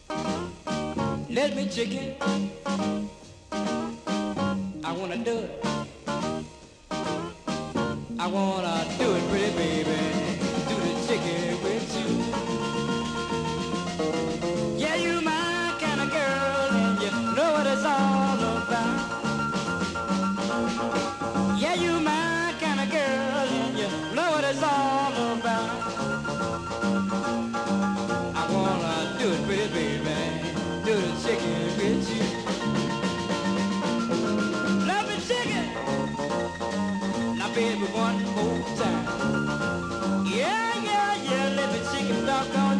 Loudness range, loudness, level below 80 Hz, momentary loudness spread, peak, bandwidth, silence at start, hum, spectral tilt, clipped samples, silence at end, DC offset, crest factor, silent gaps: 5 LU; -27 LUFS; -52 dBFS; 6 LU; -12 dBFS; 12 kHz; 0.1 s; none; -5 dB/octave; under 0.1%; 0 s; under 0.1%; 14 dB; none